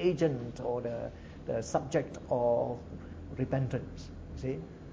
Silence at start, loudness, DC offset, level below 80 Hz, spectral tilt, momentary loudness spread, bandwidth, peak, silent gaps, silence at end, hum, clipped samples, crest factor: 0 s; -34 LUFS; under 0.1%; -50 dBFS; -7 dB/octave; 15 LU; 8 kHz; -14 dBFS; none; 0 s; none; under 0.1%; 18 dB